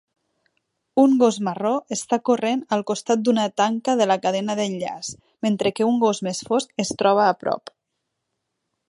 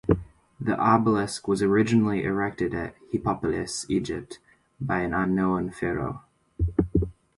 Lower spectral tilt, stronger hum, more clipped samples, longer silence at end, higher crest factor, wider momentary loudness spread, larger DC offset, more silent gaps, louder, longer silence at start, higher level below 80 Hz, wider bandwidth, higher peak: second, -4.5 dB/octave vs -6.5 dB/octave; neither; neither; first, 1.3 s vs 0.25 s; about the same, 18 dB vs 20 dB; second, 9 LU vs 12 LU; neither; neither; first, -21 LUFS vs -26 LUFS; first, 0.95 s vs 0.05 s; second, -68 dBFS vs -42 dBFS; about the same, 11.5 kHz vs 11.5 kHz; about the same, -4 dBFS vs -6 dBFS